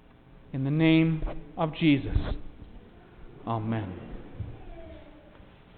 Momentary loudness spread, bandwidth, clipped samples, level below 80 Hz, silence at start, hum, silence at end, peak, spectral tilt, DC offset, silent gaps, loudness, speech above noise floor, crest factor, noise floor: 24 LU; 4.5 kHz; under 0.1%; -40 dBFS; 0.3 s; none; 0.6 s; -12 dBFS; -11 dB/octave; under 0.1%; none; -27 LUFS; 27 dB; 18 dB; -53 dBFS